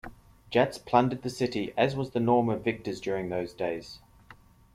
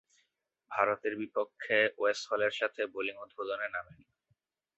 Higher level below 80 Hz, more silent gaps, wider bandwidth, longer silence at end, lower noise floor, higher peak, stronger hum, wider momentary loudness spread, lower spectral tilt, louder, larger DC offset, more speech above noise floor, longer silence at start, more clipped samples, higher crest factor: first, -58 dBFS vs -78 dBFS; neither; first, 14 kHz vs 8 kHz; second, 0.4 s vs 0.85 s; second, -55 dBFS vs -79 dBFS; first, -6 dBFS vs -12 dBFS; neither; about the same, 10 LU vs 10 LU; first, -6.5 dB/octave vs -0.5 dB/octave; first, -29 LUFS vs -33 LUFS; neither; second, 27 dB vs 46 dB; second, 0.05 s vs 0.7 s; neither; about the same, 22 dB vs 22 dB